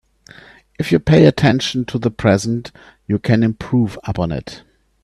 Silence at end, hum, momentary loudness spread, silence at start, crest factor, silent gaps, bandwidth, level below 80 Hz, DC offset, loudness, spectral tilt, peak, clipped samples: 0.45 s; none; 14 LU; 0.8 s; 16 dB; none; 12.5 kHz; -42 dBFS; under 0.1%; -17 LUFS; -6.5 dB/octave; 0 dBFS; under 0.1%